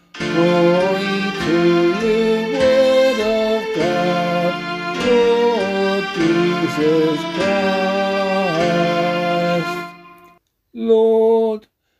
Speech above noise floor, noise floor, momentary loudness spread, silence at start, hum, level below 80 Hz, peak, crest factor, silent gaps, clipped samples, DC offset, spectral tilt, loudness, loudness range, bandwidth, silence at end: 35 dB; -52 dBFS; 6 LU; 0.15 s; none; -50 dBFS; -2 dBFS; 14 dB; none; under 0.1%; under 0.1%; -6 dB/octave; -17 LUFS; 3 LU; 14 kHz; 0.4 s